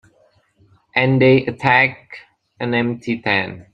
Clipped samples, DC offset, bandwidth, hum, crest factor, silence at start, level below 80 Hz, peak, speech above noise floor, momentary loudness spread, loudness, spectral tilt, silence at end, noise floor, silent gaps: under 0.1%; under 0.1%; 7.2 kHz; none; 18 dB; 0.95 s; -56 dBFS; 0 dBFS; 41 dB; 9 LU; -17 LUFS; -7.5 dB/octave; 0.1 s; -58 dBFS; none